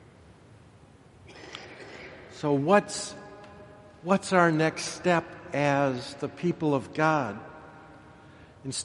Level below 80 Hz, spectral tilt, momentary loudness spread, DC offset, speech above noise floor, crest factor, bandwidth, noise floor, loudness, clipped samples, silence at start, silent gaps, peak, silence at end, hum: -64 dBFS; -5 dB/octave; 23 LU; under 0.1%; 28 dB; 24 dB; 11.5 kHz; -54 dBFS; -27 LUFS; under 0.1%; 1.3 s; none; -6 dBFS; 0 s; none